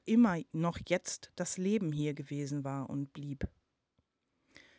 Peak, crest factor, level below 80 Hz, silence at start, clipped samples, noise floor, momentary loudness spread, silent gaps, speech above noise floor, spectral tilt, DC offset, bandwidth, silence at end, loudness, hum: -18 dBFS; 18 dB; -58 dBFS; 0.05 s; under 0.1%; -80 dBFS; 12 LU; none; 46 dB; -6 dB/octave; under 0.1%; 8 kHz; 1.3 s; -35 LUFS; none